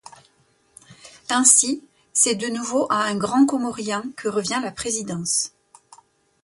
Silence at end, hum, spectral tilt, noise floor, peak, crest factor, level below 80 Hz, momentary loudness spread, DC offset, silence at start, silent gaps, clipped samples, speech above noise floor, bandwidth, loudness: 0.95 s; none; -2 dB/octave; -62 dBFS; -2 dBFS; 22 dB; -62 dBFS; 13 LU; under 0.1%; 0.9 s; none; under 0.1%; 41 dB; 12 kHz; -20 LUFS